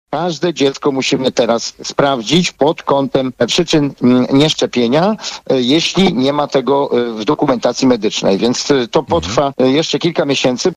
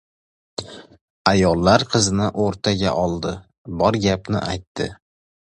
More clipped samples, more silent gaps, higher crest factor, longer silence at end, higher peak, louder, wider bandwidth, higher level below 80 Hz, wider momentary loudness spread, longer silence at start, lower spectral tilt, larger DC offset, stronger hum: neither; second, none vs 1.01-1.25 s, 3.58-3.65 s, 4.67-4.75 s; second, 12 dB vs 20 dB; second, 0 s vs 0.65 s; about the same, -2 dBFS vs 0 dBFS; first, -14 LUFS vs -20 LUFS; about the same, 11.5 kHz vs 11.5 kHz; second, -46 dBFS vs -40 dBFS; second, 4 LU vs 17 LU; second, 0.1 s vs 0.6 s; about the same, -4.5 dB/octave vs -5 dB/octave; neither; neither